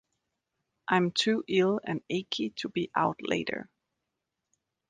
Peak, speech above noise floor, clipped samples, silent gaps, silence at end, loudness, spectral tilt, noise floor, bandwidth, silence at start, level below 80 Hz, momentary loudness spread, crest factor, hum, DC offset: -10 dBFS; 56 dB; under 0.1%; none; 1.25 s; -29 LUFS; -5 dB/octave; -85 dBFS; 9.8 kHz; 0.9 s; -70 dBFS; 7 LU; 22 dB; none; under 0.1%